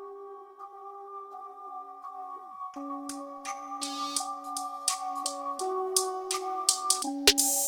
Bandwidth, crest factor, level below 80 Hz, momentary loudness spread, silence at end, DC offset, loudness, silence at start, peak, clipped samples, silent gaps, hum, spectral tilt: 19.5 kHz; 28 dB; -62 dBFS; 20 LU; 0 s; under 0.1%; -29 LUFS; 0 s; -4 dBFS; under 0.1%; none; none; 0.5 dB/octave